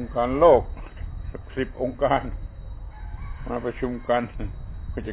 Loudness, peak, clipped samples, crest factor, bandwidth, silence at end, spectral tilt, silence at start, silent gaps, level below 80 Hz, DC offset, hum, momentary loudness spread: -24 LUFS; -4 dBFS; under 0.1%; 20 dB; 4 kHz; 0 s; -10.5 dB/octave; 0 s; none; -36 dBFS; under 0.1%; none; 21 LU